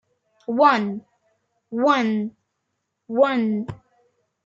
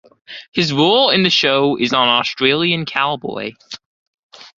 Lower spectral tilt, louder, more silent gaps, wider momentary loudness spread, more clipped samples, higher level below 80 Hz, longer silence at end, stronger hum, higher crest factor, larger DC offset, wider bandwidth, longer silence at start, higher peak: first, -6.5 dB/octave vs -4.5 dB/octave; second, -21 LUFS vs -15 LUFS; second, none vs 0.48-0.52 s, 3.86-4.29 s; second, 18 LU vs 22 LU; neither; second, -66 dBFS vs -58 dBFS; first, 0.7 s vs 0.1 s; neither; about the same, 20 dB vs 16 dB; neither; about the same, 7.6 kHz vs 7.6 kHz; first, 0.5 s vs 0.3 s; second, -4 dBFS vs 0 dBFS